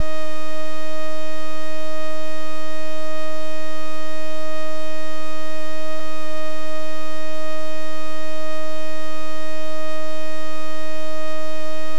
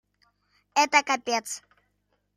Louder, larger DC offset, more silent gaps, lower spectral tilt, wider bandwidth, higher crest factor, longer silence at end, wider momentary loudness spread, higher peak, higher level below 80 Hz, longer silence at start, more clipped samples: second, -31 LUFS vs -24 LUFS; first, 40% vs under 0.1%; neither; first, -5 dB/octave vs 0 dB/octave; about the same, 16 kHz vs 15 kHz; about the same, 22 dB vs 24 dB; second, 0 s vs 0.8 s; second, 2 LU vs 15 LU; about the same, -8 dBFS vs -6 dBFS; first, -54 dBFS vs -76 dBFS; second, 0 s vs 0.75 s; neither